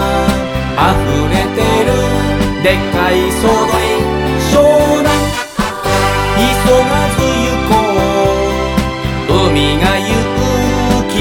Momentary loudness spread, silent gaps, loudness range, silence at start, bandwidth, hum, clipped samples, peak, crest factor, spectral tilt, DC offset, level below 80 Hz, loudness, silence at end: 5 LU; none; 1 LU; 0 s; 18.5 kHz; none; under 0.1%; 0 dBFS; 12 dB; -5 dB/octave; under 0.1%; -24 dBFS; -12 LUFS; 0 s